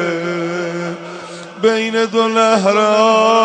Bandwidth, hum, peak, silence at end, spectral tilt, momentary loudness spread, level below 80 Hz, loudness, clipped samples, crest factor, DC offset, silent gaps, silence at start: 9.8 kHz; none; 0 dBFS; 0 s; -4.5 dB/octave; 17 LU; -66 dBFS; -14 LUFS; under 0.1%; 14 dB; under 0.1%; none; 0 s